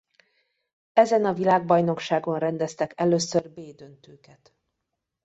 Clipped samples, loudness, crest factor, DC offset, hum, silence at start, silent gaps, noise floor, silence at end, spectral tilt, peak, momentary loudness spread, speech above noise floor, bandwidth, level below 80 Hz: under 0.1%; -23 LUFS; 22 dB; under 0.1%; none; 0.95 s; none; -82 dBFS; 1.35 s; -5.5 dB/octave; -4 dBFS; 9 LU; 58 dB; 8.2 kHz; -68 dBFS